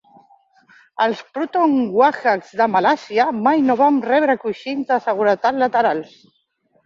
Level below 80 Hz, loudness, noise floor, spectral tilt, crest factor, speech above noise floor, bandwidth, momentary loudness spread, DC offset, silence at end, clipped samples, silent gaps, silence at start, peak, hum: -66 dBFS; -18 LUFS; -63 dBFS; -6 dB/octave; 16 dB; 46 dB; 7.4 kHz; 7 LU; under 0.1%; 0.8 s; under 0.1%; none; 1 s; -2 dBFS; none